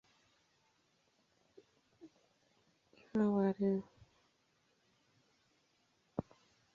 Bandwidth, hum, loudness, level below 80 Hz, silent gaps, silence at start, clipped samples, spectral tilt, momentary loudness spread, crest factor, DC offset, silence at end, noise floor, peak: 7 kHz; none; -37 LUFS; -76 dBFS; none; 2.05 s; under 0.1%; -8.5 dB/octave; 13 LU; 20 dB; under 0.1%; 0.55 s; -77 dBFS; -22 dBFS